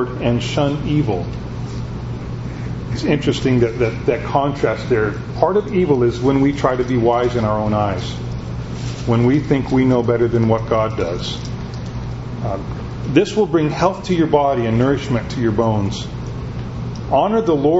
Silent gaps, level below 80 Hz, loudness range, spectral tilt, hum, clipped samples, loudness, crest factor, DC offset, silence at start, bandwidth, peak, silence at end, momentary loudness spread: none; -34 dBFS; 4 LU; -7.5 dB/octave; none; under 0.1%; -19 LUFS; 18 dB; under 0.1%; 0 s; 8 kHz; 0 dBFS; 0 s; 11 LU